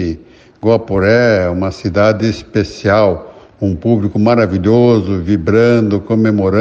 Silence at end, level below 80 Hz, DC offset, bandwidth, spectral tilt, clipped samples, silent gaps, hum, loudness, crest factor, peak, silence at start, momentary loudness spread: 0 s; -38 dBFS; under 0.1%; 7.6 kHz; -8 dB/octave; under 0.1%; none; none; -13 LUFS; 12 dB; 0 dBFS; 0 s; 8 LU